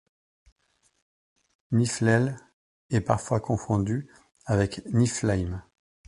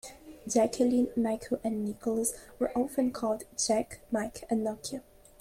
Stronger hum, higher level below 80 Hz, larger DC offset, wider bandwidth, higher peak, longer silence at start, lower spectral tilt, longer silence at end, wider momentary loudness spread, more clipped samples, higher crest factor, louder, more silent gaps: neither; first, -48 dBFS vs -60 dBFS; neither; second, 11.5 kHz vs 16 kHz; first, -6 dBFS vs -14 dBFS; first, 1.7 s vs 0.05 s; first, -6 dB/octave vs -4 dB/octave; about the same, 0.45 s vs 0.4 s; about the same, 10 LU vs 8 LU; neither; first, 22 dB vs 16 dB; first, -26 LUFS vs -31 LUFS; first, 2.53-2.89 s vs none